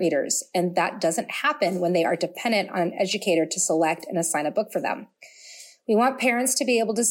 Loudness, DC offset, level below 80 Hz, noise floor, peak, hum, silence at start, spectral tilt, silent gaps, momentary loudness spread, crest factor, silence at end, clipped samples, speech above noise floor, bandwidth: -24 LUFS; under 0.1%; -76 dBFS; -47 dBFS; -10 dBFS; none; 0 s; -3 dB/octave; none; 7 LU; 16 dB; 0 s; under 0.1%; 23 dB; 17 kHz